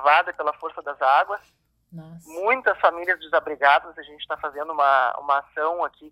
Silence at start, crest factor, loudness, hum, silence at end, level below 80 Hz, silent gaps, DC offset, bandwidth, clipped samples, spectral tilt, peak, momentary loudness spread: 0 s; 20 dB; -22 LUFS; none; 0.05 s; -66 dBFS; none; under 0.1%; 13.5 kHz; under 0.1%; -4 dB/octave; -4 dBFS; 15 LU